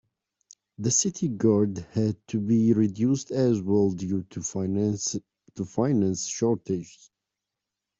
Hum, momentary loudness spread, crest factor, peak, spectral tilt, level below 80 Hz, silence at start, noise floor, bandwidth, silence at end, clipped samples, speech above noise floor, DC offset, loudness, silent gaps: none; 10 LU; 18 dB; -10 dBFS; -6 dB/octave; -64 dBFS; 0.8 s; -86 dBFS; 8.2 kHz; 1.1 s; under 0.1%; 61 dB; under 0.1%; -26 LUFS; none